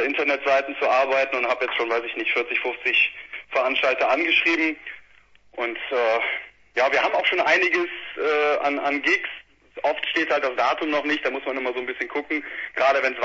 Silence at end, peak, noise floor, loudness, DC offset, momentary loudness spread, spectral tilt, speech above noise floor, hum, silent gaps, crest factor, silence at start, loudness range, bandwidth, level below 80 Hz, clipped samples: 0 s; -6 dBFS; -54 dBFS; -22 LUFS; under 0.1%; 10 LU; -2.5 dB/octave; 31 dB; none; none; 16 dB; 0 s; 2 LU; 7.8 kHz; -64 dBFS; under 0.1%